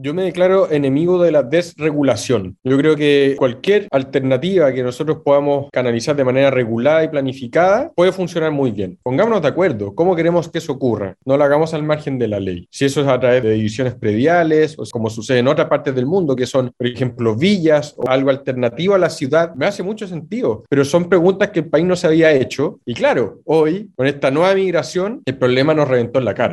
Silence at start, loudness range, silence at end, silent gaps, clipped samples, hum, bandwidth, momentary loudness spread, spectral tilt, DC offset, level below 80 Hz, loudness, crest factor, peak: 0 s; 2 LU; 0 s; none; under 0.1%; none; 12 kHz; 7 LU; -6.5 dB/octave; under 0.1%; -56 dBFS; -16 LUFS; 16 dB; 0 dBFS